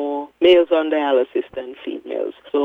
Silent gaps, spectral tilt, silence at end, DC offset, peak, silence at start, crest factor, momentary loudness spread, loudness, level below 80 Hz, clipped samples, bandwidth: none; -5.5 dB/octave; 0 s; under 0.1%; -2 dBFS; 0 s; 16 dB; 16 LU; -18 LUFS; -60 dBFS; under 0.1%; 4.3 kHz